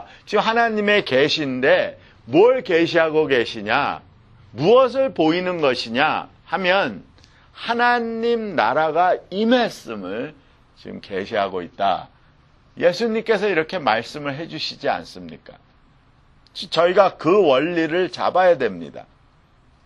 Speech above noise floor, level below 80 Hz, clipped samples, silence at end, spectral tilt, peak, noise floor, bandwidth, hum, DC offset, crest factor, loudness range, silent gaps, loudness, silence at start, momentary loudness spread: 35 dB; -58 dBFS; under 0.1%; 0.85 s; -5.5 dB/octave; 0 dBFS; -55 dBFS; 11.5 kHz; none; under 0.1%; 20 dB; 6 LU; none; -19 LUFS; 0 s; 14 LU